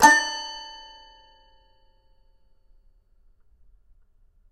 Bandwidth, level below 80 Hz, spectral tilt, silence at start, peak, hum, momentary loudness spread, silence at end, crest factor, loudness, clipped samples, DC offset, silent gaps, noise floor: 16 kHz; -60 dBFS; -0.5 dB/octave; 0 s; -2 dBFS; none; 28 LU; 3.8 s; 26 dB; -22 LUFS; under 0.1%; under 0.1%; none; -59 dBFS